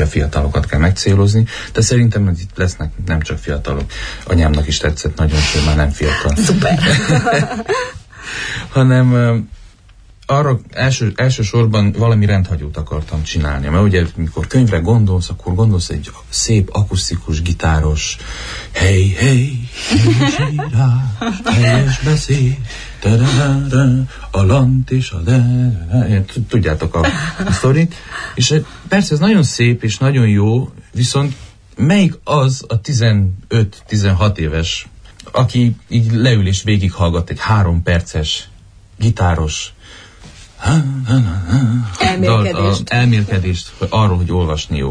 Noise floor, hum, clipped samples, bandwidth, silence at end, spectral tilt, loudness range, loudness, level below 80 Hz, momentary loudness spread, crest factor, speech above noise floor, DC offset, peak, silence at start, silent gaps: -43 dBFS; none; under 0.1%; 10.5 kHz; 0 s; -5.5 dB/octave; 3 LU; -15 LUFS; -26 dBFS; 9 LU; 14 dB; 29 dB; under 0.1%; 0 dBFS; 0 s; none